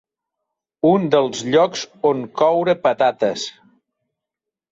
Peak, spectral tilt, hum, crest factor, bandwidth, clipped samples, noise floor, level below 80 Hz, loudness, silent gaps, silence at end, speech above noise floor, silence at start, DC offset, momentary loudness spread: -2 dBFS; -5 dB/octave; none; 16 dB; 7.8 kHz; under 0.1%; -85 dBFS; -64 dBFS; -18 LUFS; none; 1.2 s; 68 dB; 0.85 s; under 0.1%; 6 LU